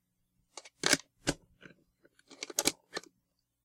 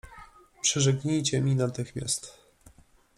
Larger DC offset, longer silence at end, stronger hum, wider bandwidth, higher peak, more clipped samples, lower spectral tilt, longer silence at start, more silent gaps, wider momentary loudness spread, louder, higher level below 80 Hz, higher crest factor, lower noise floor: neither; second, 0.65 s vs 0.85 s; neither; first, 16.5 kHz vs 13 kHz; first, -8 dBFS vs -12 dBFS; neither; second, -1.5 dB/octave vs -4.5 dB/octave; first, 0.55 s vs 0.05 s; neither; first, 22 LU vs 8 LU; second, -33 LUFS vs -27 LUFS; about the same, -62 dBFS vs -58 dBFS; first, 32 dB vs 18 dB; first, -80 dBFS vs -58 dBFS